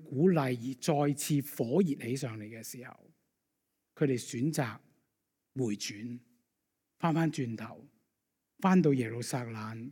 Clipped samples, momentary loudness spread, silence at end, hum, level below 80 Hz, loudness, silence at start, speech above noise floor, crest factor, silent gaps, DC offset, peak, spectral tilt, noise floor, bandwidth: under 0.1%; 17 LU; 0 s; none; -78 dBFS; -32 LUFS; 0 s; 53 dB; 18 dB; none; under 0.1%; -14 dBFS; -6 dB/octave; -84 dBFS; 17.5 kHz